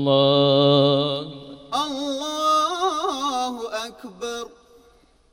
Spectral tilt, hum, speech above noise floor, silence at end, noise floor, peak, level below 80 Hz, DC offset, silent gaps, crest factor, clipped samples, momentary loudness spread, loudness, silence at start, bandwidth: -5 dB/octave; none; 38 dB; 0.85 s; -56 dBFS; -6 dBFS; -60 dBFS; under 0.1%; none; 16 dB; under 0.1%; 17 LU; -21 LUFS; 0 s; 16.5 kHz